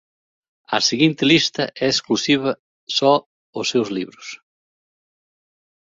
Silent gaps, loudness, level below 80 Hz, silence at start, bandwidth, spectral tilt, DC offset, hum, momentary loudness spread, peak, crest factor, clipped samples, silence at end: 2.59-2.87 s, 3.26-3.53 s; -19 LUFS; -62 dBFS; 0.7 s; 7.8 kHz; -3.5 dB/octave; under 0.1%; none; 17 LU; -2 dBFS; 20 dB; under 0.1%; 1.5 s